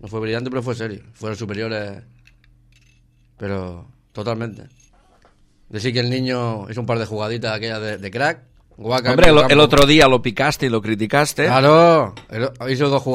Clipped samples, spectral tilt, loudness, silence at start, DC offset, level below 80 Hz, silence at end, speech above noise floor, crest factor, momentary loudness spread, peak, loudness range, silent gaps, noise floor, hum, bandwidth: under 0.1%; -5 dB/octave; -17 LUFS; 0.05 s; under 0.1%; -36 dBFS; 0 s; 38 dB; 18 dB; 19 LU; 0 dBFS; 18 LU; none; -55 dBFS; none; 16 kHz